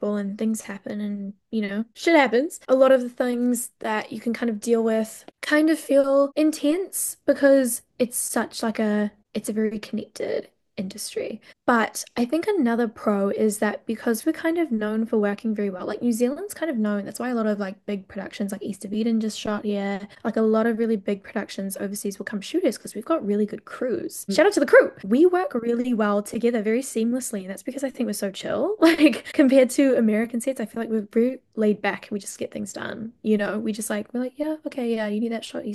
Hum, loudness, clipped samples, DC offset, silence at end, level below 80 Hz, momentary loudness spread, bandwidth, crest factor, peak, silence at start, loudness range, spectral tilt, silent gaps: none; -24 LUFS; under 0.1%; under 0.1%; 0 s; -66 dBFS; 12 LU; 12.5 kHz; 20 dB; -4 dBFS; 0 s; 6 LU; -4.5 dB/octave; none